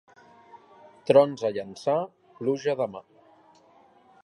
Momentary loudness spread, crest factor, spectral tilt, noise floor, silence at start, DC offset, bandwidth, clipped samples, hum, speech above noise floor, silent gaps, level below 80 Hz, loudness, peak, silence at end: 18 LU; 22 dB; -6.5 dB/octave; -58 dBFS; 0.55 s; under 0.1%; 11 kHz; under 0.1%; none; 33 dB; none; -76 dBFS; -25 LUFS; -6 dBFS; 1.25 s